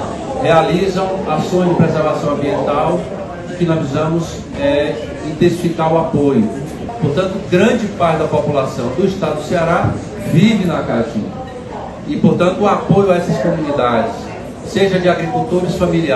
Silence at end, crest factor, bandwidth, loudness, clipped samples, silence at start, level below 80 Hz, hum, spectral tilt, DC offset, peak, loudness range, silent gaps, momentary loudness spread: 0 s; 14 dB; 12.5 kHz; -15 LUFS; under 0.1%; 0 s; -38 dBFS; none; -7 dB/octave; under 0.1%; 0 dBFS; 2 LU; none; 11 LU